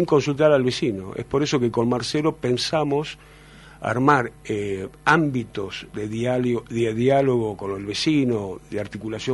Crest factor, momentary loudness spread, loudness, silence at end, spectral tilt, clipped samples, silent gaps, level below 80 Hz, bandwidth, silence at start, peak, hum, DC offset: 20 dB; 12 LU; -23 LUFS; 0 s; -5.5 dB/octave; under 0.1%; none; -52 dBFS; 11.5 kHz; 0 s; -2 dBFS; none; under 0.1%